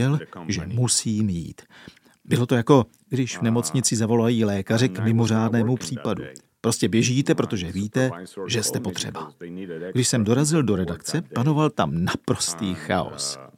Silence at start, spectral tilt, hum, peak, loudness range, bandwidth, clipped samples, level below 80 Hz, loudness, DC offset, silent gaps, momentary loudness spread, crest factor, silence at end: 0 s; -5 dB/octave; none; -2 dBFS; 3 LU; 16 kHz; under 0.1%; -54 dBFS; -23 LUFS; under 0.1%; none; 9 LU; 22 dB; 0.1 s